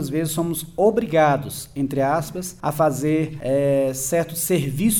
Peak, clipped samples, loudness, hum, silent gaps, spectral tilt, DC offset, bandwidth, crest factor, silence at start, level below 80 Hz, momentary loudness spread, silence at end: -4 dBFS; under 0.1%; -21 LUFS; none; none; -5.5 dB/octave; under 0.1%; over 20 kHz; 16 dB; 0 s; -48 dBFS; 8 LU; 0 s